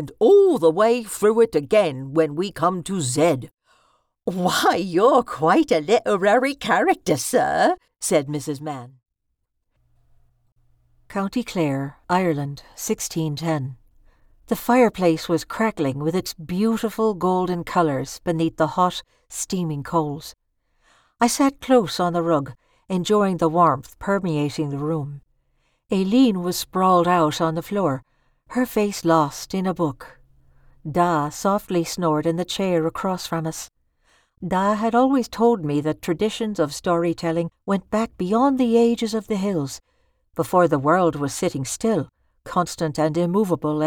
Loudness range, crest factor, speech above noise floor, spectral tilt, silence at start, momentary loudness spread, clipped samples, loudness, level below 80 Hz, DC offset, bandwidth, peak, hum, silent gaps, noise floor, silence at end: 6 LU; 16 dB; 55 dB; -5.5 dB/octave; 0 s; 10 LU; under 0.1%; -21 LUFS; -54 dBFS; under 0.1%; 19.5 kHz; -4 dBFS; none; 10.52-10.56 s; -75 dBFS; 0 s